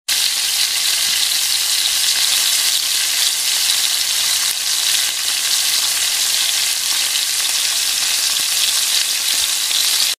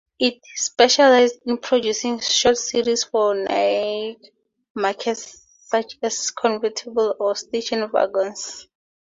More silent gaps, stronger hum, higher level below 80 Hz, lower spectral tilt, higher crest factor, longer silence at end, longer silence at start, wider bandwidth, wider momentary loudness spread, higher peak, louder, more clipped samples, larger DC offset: second, none vs 4.70-4.75 s; neither; about the same, -60 dBFS vs -62 dBFS; second, 4 dB/octave vs -1.5 dB/octave; about the same, 18 dB vs 20 dB; second, 0.05 s vs 0.6 s; about the same, 0.1 s vs 0.2 s; first, 16 kHz vs 7.8 kHz; second, 2 LU vs 11 LU; about the same, 0 dBFS vs -2 dBFS; first, -14 LUFS vs -20 LUFS; neither; neither